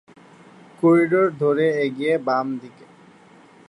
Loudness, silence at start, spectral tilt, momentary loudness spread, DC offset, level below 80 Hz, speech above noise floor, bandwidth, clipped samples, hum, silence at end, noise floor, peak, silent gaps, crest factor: -20 LUFS; 0.8 s; -8 dB/octave; 7 LU; under 0.1%; -70 dBFS; 30 dB; 11 kHz; under 0.1%; none; 1 s; -49 dBFS; -6 dBFS; none; 16 dB